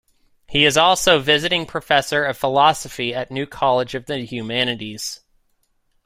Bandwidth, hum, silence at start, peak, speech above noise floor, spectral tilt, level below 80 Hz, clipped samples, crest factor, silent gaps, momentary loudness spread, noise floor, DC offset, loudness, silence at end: 16 kHz; none; 0.5 s; -2 dBFS; 46 dB; -3 dB/octave; -50 dBFS; under 0.1%; 18 dB; none; 13 LU; -65 dBFS; under 0.1%; -18 LUFS; 0.9 s